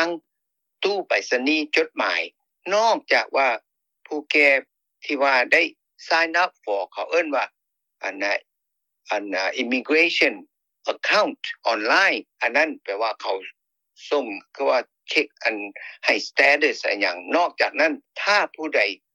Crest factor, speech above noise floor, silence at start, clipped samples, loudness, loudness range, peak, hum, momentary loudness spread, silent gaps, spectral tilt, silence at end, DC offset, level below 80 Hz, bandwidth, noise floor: 18 dB; 58 dB; 0 s; under 0.1%; -21 LUFS; 4 LU; -4 dBFS; none; 13 LU; none; -1.5 dB/octave; 0.2 s; under 0.1%; -78 dBFS; 12 kHz; -80 dBFS